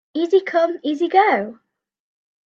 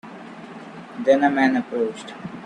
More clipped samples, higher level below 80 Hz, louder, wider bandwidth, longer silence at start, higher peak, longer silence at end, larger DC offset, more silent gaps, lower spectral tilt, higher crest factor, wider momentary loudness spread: neither; second, -76 dBFS vs -66 dBFS; about the same, -18 LUFS vs -20 LUFS; second, 7.2 kHz vs 10 kHz; about the same, 0.15 s vs 0.05 s; about the same, -2 dBFS vs -4 dBFS; first, 0.9 s vs 0 s; neither; neither; about the same, -5.5 dB/octave vs -6 dB/octave; about the same, 18 dB vs 18 dB; second, 7 LU vs 21 LU